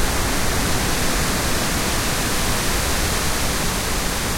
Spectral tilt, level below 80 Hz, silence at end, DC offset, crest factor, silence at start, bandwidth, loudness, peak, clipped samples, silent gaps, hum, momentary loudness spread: -3 dB/octave; -26 dBFS; 0 s; under 0.1%; 12 dB; 0 s; 16.5 kHz; -20 LUFS; -6 dBFS; under 0.1%; none; none; 1 LU